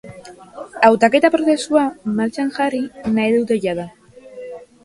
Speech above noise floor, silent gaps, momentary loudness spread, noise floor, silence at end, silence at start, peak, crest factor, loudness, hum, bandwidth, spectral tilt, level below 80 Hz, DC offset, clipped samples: 22 dB; none; 22 LU; -39 dBFS; 0.2 s; 0.05 s; 0 dBFS; 18 dB; -17 LUFS; none; 11.5 kHz; -5 dB/octave; -58 dBFS; under 0.1%; under 0.1%